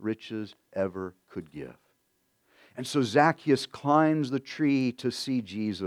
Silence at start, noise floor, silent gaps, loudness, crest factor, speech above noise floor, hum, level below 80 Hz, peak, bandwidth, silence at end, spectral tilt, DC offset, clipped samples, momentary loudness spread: 0 s; -73 dBFS; none; -27 LUFS; 22 dB; 45 dB; none; -72 dBFS; -6 dBFS; 14 kHz; 0 s; -6 dB/octave; under 0.1%; under 0.1%; 19 LU